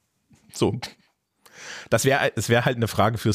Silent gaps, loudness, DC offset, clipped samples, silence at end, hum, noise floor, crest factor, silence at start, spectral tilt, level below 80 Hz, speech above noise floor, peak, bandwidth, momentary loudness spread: none; -23 LUFS; under 0.1%; under 0.1%; 0 s; none; -60 dBFS; 16 dB; 0.55 s; -5 dB/octave; -56 dBFS; 38 dB; -8 dBFS; 15.5 kHz; 18 LU